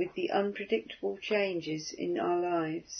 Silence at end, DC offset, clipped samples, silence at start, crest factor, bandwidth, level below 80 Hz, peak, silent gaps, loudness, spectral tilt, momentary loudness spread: 0 s; under 0.1%; under 0.1%; 0 s; 16 dB; 6.4 kHz; -72 dBFS; -16 dBFS; none; -32 LUFS; -3.5 dB/octave; 6 LU